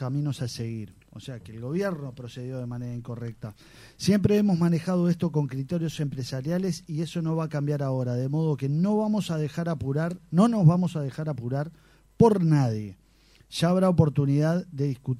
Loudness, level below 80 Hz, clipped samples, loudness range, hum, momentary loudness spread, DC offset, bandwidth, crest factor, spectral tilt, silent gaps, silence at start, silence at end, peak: -26 LUFS; -56 dBFS; under 0.1%; 7 LU; none; 16 LU; under 0.1%; 14 kHz; 20 dB; -7.5 dB/octave; none; 0 s; 0 s; -6 dBFS